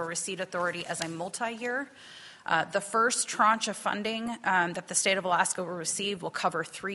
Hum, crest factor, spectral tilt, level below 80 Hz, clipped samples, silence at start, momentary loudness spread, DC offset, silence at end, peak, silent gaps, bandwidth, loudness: none; 20 dB; -2 dB/octave; -74 dBFS; under 0.1%; 0 s; 9 LU; under 0.1%; 0 s; -10 dBFS; none; 11.5 kHz; -29 LUFS